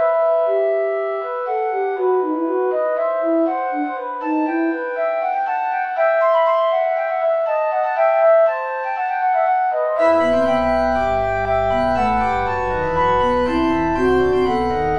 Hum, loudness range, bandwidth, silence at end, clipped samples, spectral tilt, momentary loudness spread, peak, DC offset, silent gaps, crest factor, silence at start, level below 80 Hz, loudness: none; 3 LU; 9.4 kHz; 0 s; under 0.1%; -7 dB/octave; 6 LU; -6 dBFS; under 0.1%; none; 12 dB; 0 s; -40 dBFS; -18 LUFS